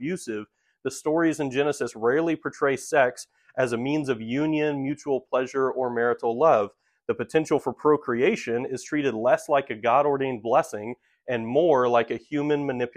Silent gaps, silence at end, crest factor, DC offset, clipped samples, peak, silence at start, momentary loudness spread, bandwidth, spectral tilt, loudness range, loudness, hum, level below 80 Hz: none; 0.05 s; 18 dB; under 0.1%; under 0.1%; -6 dBFS; 0 s; 11 LU; 14.5 kHz; -5.5 dB/octave; 2 LU; -25 LUFS; none; -66 dBFS